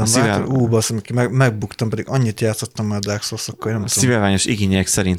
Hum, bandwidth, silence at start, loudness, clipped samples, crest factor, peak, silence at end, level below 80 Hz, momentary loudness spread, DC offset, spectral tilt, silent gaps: none; 16 kHz; 0 s; -18 LUFS; under 0.1%; 14 dB; -4 dBFS; 0 s; -46 dBFS; 8 LU; under 0.1%; -4.5 dB/octave; none